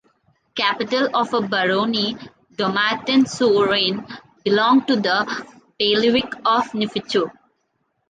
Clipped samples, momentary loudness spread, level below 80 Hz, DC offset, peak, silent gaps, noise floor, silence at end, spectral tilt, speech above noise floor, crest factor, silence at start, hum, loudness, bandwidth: under 0.1%; 12 LU; -62 dBFS; under 0.1%; -4 dBFS; none; -70 dBFS; 0.8 s; -4.5 dB/octave; 51 dB; 18 dB; 0.55 s; none; -19 LUFS; 9.4 kHz